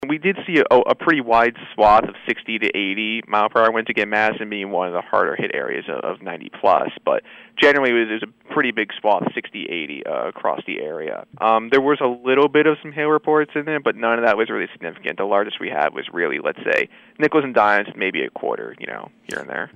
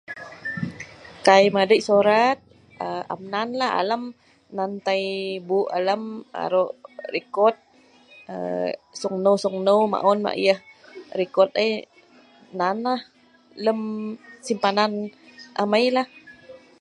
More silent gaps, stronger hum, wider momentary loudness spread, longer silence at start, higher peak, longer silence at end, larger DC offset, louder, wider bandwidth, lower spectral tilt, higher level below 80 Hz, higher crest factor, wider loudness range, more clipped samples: neither; neither; second, 12 LU vs 16 LU; about the same, 0 s vs 0.1 s; about the same, -4 dBFS vs -2 dBFS; second, 0.1 s vs 0.25 s; neither; first, -19 LUFS vs -23 LUFS; second, 9.2 kHz vs 11.5 kHz; about the same, -6 dB/octave vs -5 dB/octave; first, -56 dBFS vs -68 dBFS; second, 16 dB vs 22 dB; about the same, 4 LU vs 5 LU; neither